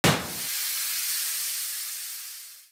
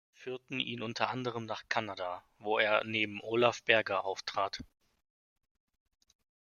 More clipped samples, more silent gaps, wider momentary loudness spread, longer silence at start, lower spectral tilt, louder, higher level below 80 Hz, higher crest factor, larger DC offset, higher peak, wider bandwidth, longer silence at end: neither; neither; second, 10 LU vs 13 LU; second, 0.05 s vs 0.2 s; second, -2 dB/octave vs -4 dB/octave; first, -27 LUFS vs -33 LUFS; first, -60 dBFS vs -70 dBFS; second, 20 dB vs 28 dB; neither; about the same, -8 dBFS vs -8 dBFS; first, over 20 kHz vs 7.2 kHz; second, 0.05 s vs 1.9 s